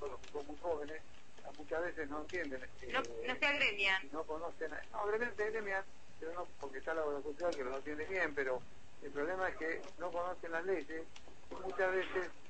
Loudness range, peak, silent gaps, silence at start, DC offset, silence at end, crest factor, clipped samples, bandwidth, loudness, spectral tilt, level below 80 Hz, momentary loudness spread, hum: 5 LU; -20 dBFS; none; 0 s; 0.5%; 0 s; 20 dB; under 0.1%; 8.4 kHz; -39 LUFS; -3.5 dB/octave; -64 dBFS; 14 LU; none